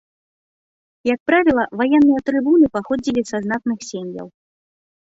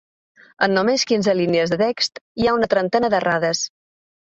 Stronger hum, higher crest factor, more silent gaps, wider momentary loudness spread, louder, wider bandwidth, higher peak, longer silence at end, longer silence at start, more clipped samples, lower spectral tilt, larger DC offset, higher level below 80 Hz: neither; about the same, 16 dB vs 16 dB; second, 1.20-1.26 s vs 2.21-2.35 s; first, 14 LU vs 5 LU; about the same, -18 LUFS vs -19 LUFS; about the same, 7.8 kHz vs 8 kHz; about the same, -2 dBFS vs -4 dBFS; first, 0.75 s vs 0.55 s; first, 1.05 s vs 0.6 s; neither; first, -5.5 dB/octave vs -4 dB/octave; neither; about the same, -54 dBFS vs -54 dBFS